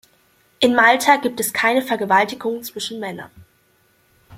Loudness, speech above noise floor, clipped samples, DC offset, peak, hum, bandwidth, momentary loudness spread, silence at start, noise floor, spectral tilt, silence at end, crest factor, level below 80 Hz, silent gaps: -17 LUFS; 41 dB; under 0.1%; under 0.1%; 0 dBFS; none; 16.5 kHz; 15 LU; 0.6 s; -60 dBFS; -2.5 dB/octave; 0 s; 20 dB; -62 dBFS; none